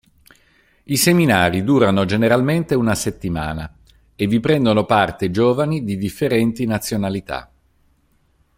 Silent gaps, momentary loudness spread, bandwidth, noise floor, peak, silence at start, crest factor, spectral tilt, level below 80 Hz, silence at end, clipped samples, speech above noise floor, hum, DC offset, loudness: none; 9 LU; 16.5 kHz; -60 dBFS; -2 dBFS; 0.9 s; 18 dB; -5.5 dB/octave; -46 dBFS; 1.15 s; under 0.1%; 43 dB; none; under 0.1%; -18 LUFS